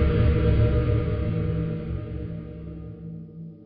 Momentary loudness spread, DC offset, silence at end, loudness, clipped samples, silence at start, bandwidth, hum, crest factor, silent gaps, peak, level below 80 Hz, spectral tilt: 17 LU; under 0.1%; 0 s; -25 LUFS; under 0.1%; 0 s; 4.9 kHz; none; 14 dB; none; -10 dBFS; -30 dBFS; -8.5 dB/octave